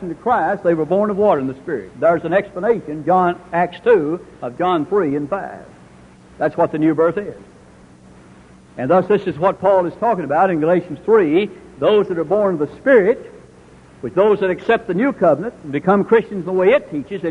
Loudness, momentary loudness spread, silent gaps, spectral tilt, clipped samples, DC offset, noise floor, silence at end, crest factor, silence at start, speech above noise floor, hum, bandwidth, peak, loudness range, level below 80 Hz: -17 LUFS; 10 LU; none; -8 dB/octave; under 0.1%; under 0.1%; -44 dBFS; 0 s; 16 dB; 0 s; 28 dB; none; 10 kHz; 0 dBFS; 4 LU; -52 dBFS